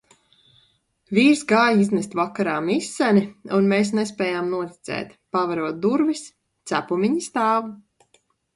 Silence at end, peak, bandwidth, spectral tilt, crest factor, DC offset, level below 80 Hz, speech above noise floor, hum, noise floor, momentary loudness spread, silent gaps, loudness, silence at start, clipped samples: 0.8 s; -4 dBFS; 11.5 kHz; -5.5 dB/octave; 18 dB; under 0.1%; -64 dBFS; 43 dB; none; -64 dBFS; 12 LU; none; -22 LUFS; 1.1 s; under 0.1%